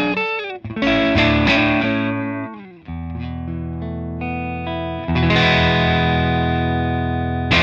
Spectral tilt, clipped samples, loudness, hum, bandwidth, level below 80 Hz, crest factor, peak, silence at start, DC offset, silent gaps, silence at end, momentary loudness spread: -6.5 dB/octave; under 0.1%; -19 LUFS; none; 7.4 kHz; -32 dBFS; 16 dB; -2 dBFS; 0 s; under 0.1%; none; 0 s; 14 LU